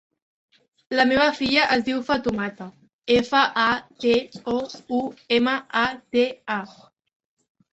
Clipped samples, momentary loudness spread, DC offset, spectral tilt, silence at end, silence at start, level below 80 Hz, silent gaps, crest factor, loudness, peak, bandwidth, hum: under 0.1%; 11 LU; under 0.1%; -4.5 dB/octave; 1 s; 0.9 s; -56 dBFS; 2.93-3.02 s; 20 dB; -22 LUFS; -2 dBFS; 8.2 kHz; none